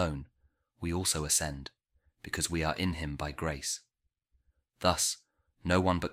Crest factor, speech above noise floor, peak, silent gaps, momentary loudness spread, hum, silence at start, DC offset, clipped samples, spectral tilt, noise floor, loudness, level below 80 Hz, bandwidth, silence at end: 24 dB; 49 dB; -10 dBFS; none; 14 LU; none; 0 s; under 0.1%; under 0.1%; -3.5 dB/octave; -81 dBFS; -32 LUFS; -48 dBFS; 16.5 kHz; 0 s